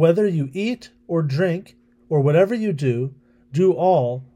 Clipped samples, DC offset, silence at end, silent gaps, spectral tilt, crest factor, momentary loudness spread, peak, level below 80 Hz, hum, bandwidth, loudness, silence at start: under 0.1%; under 0.1%; 0.1 s; none; -8.5 dB/octave; 16 dB; 10 LU; -4 dBFS; -64 dBFS; none; 10.5 kHz; -21 LUFS; 0 s